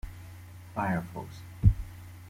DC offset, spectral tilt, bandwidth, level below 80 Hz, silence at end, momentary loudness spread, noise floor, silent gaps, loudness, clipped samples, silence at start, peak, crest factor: under 0.1%; -8 dB/octave; 16 kHz; -38 dBFS; 0 s; 20 LU; -47 dBFS; none; -31 LUFS; under 0.1%; 0.05 s; -8 dBFS; 24 dB